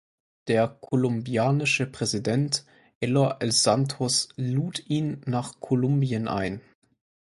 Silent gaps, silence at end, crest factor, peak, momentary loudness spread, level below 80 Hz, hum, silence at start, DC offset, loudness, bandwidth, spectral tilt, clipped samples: 2.95-3.01 s; 0.6 s; 18 dB; -8 dBFS; 7 LU; -60 dBFS; none; 0.45 s; under 0.1%; -25 LUFS; 11.5 kHz; -4.5 dB/octave; under 0.1%